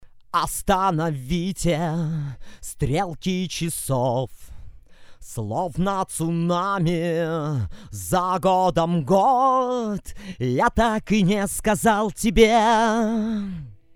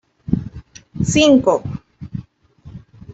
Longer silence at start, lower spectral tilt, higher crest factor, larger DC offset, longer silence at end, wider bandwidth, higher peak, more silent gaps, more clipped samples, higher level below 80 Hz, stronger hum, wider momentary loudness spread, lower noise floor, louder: second, 0 s vs 0.3 s; about the same, -5.5 dB/octave vs -5 dB/octave; about the same, 20 dB vs 18 dB; neither; second, 0.2 s vs 0.35 s; first, 17.5 kHz vs 8.2 kHz; about the same, -2 dBFS vs -2 dBFS; neither; neither; about the same, -40 dBFS vs -42 dBFS; neither; second, 12 LU vs 21 LU; about the same, -43 dBFS vs -44 dBFS; second, -22 LUFS vs -16 LUFS